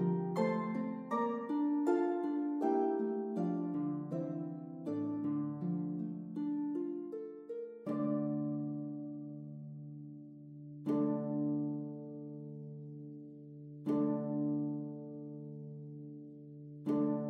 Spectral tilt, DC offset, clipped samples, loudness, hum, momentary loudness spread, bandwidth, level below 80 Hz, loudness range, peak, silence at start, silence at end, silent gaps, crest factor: -10 dB/octave; under 0.1%; under 0.1%; -38 LUFS; none; 15 LU; 7.6 kHz; -90 dBFS; 5 LU; -20 dBFS; 0 s; 0 s; none; 18 dB